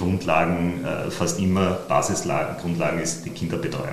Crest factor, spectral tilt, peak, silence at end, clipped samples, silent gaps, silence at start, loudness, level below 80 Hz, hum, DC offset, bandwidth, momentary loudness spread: 20 dB; -5 dB/octave; -4 dBFS; 0 s; under 0.1%; none; 0 s; -24 LUFS; -52 dBFS; none; 0.7%; 13.5 kHz; 7 LU